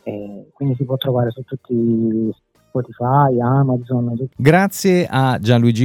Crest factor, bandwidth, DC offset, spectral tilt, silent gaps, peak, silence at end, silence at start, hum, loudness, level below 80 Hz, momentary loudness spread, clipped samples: 16 dB; 18 kHz; under 0.1%; -7 dB/octave; none; 0 dBFS; 0 s; 0.05 s; none; -17 LUFS; -56 dBFS; 11 LU; under 0.1%